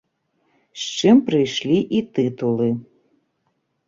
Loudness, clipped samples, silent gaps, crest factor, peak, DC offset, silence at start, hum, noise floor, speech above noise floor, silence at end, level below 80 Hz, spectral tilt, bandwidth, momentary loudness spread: -19 LUFS; under 0.1%; none; 18 dB; -4 dBFS; under 0.1%; 0.75 s; none; -71 dBFS; 52 dB; 1.05 s; -60 dBFS; -5.5 dB/octave; 7.6 kHz; 14 LU